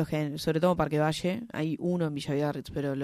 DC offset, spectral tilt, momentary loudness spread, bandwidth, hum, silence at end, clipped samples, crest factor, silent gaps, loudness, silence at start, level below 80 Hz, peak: under 0.1%; -6.5 dB/octave; 7 LU; 15 kHz; none; 0 s; under 0.1%; 18 dB; none; -29 LUFS; 0 s; -54 dBFS; -12 dBFS